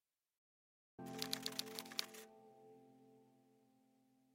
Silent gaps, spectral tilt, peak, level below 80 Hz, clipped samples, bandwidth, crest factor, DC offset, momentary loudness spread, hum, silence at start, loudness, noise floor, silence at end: none; -2 dB/octave; -16 dBFS; -90 dBFS; under 0.1%; 16.5 kHz; 38 dB; under 0.1%; 23 LU; none; 1 s; -46 LUFS; -76 dBFS; 0.75 s